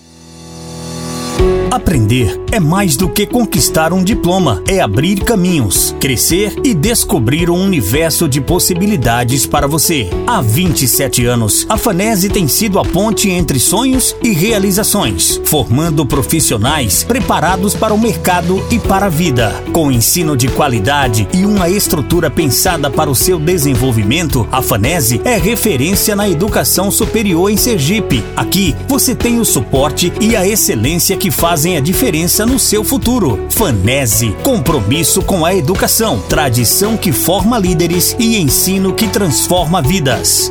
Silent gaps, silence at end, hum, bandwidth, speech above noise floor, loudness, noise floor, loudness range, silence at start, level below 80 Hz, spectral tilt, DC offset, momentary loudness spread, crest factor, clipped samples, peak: none; 0 s; none; over 20 kHz; 23 dB; -11 LUFS; -35 dBFS; 1 LU; 0.2 s; -26 dBFS; -4 dB/octave; 0.2%; 3 LU; 12 dB; under 0.1%; 0 dBFS